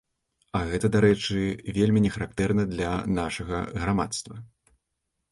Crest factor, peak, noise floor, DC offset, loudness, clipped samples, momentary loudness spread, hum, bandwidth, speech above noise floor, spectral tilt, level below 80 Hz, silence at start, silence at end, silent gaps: 18 dB; -8 dBFS; -80 dBFS; under 0.1%; -26 LUFS; under 0.1%; 10 LU; none; 11.5 kHz; 55 dB; -6 dB/octave; -44 dBFS; 0.55 s; 0.85 s; none